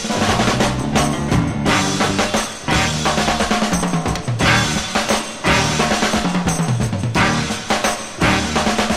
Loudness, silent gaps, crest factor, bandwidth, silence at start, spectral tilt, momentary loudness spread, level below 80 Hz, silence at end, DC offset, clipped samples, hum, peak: -17 LUFS; none; 16 dB; 16 kHz; 0 s; -4 dB/octave; 4 LU; -34 dBFS; 0 s; 0.7%; under 0.1%; none; 0 dBFS